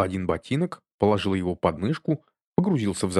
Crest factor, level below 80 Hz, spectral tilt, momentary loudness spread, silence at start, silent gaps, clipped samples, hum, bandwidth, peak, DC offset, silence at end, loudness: 20 dB; -52 dBFS; -6.5 dB/octave; 6 LU; 0 s; 0.93-0.98 s, 2.47-2.52 s; under 0.1%; none; 12.5 kHz; -6 dBFS; under 0.1%; 0 s; -26 LUFS